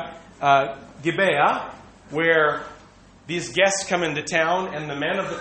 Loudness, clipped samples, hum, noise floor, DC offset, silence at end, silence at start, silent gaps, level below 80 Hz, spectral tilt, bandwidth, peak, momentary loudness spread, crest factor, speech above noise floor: -22 LUFS; under 0.1%; none; -49 dBFS; under 0.1%; 0 s; 0 s; none; -58 dBFS; -3.5 dB/octave; 8.8 kHz; -4 dBFS; 12 LU; 20 dB; 28 dB